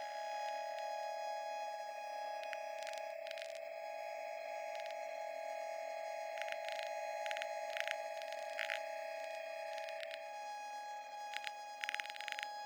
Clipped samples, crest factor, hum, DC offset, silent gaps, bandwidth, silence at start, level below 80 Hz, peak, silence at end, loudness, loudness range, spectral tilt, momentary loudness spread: under 0.1%; 26 dB; none; under 0.1%; none; over 20 kHz; 0 s; under -90 dBFS; -18 dBFS; 0 s; -44 LUFS; 3 LU; 1.5 dB/octave; 5 LU